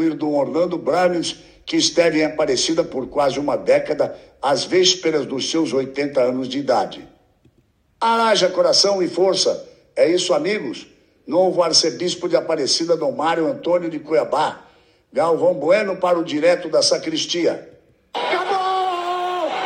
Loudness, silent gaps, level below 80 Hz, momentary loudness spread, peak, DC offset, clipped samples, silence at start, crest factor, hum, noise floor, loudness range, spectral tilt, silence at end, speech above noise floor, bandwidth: -19 LUFS; none; -60 dBFS; 8 LU; -2 dBFS; under 0.1%; under 0.1%; 0 s; 18 dB; none; -60 dBFS; 2 LU; -3 dB/octave; 0 s; 42 dB; 10.5 kHz